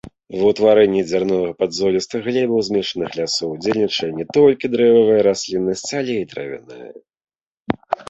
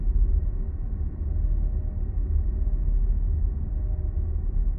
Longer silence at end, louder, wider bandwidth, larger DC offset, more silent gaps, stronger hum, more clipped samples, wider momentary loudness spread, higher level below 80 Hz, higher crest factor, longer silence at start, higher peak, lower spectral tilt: about the same, 0.05 s vs 0 s; first, -18 LUFS vs -29 LUFS; first, 8.2 kHz vs 2 kHz; neither; first, 7.41-7.55 s vs none; neither; neither; first, 13 LU vs 5 LU; second, -54 dBFS vs -24 dBFS; about the same, 16 dB vs 12 dB; about the same, 0.05 s vs 0 s; first, -2 dBFS vs -12 dBFS; second, -5 dB/octave vs -13.5 dB/octave